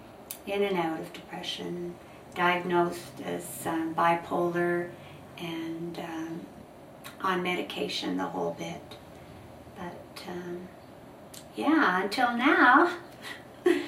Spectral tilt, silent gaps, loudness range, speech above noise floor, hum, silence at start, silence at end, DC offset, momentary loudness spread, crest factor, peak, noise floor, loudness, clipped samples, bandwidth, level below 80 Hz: -5 dB/octave; none; 10 LU; 20 dB; none; 0 s; 0 s; under 0.1%; 23 LU; 22 dB; -8 dBFS; -48 dBFS; -28 LUFS; under 0.1%; 16 kHz; -66 dBFS